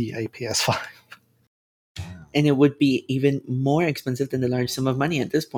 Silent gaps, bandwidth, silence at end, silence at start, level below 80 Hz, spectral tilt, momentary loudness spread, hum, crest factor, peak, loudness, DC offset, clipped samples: 1.47-1.95 s; over 20 kHz; 0 s; 0 s; -58 dBFS; -5.5 dB/octave; 16 LU; none; 18 dB; -6 dBFS; -23 LUFS; under 0.1%; under 0.1%